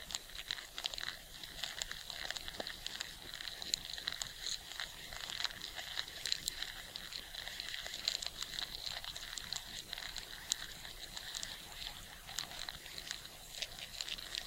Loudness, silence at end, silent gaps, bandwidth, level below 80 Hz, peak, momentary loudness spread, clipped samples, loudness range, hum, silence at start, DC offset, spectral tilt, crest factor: -42 LUFS; 0 s; none; 17 kHz; -60 dBFS; -10 dBFS; 7 LU; under 0.1%; 3 LU; none; 0 s; under 0.1%; 0 dB/octave; 34 dB